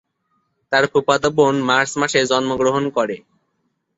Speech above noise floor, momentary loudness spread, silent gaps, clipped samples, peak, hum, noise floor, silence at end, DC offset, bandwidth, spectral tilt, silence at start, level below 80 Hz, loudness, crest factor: 53 dB; 6 LU; none; under 0.1%; -2 dBFS; none; -70 dBFS; 0.8 s; under 0.1%; 8 kHz; -4 dB/octave; 0.7 s; -56 dBFS; -17 LUFS; 18 dB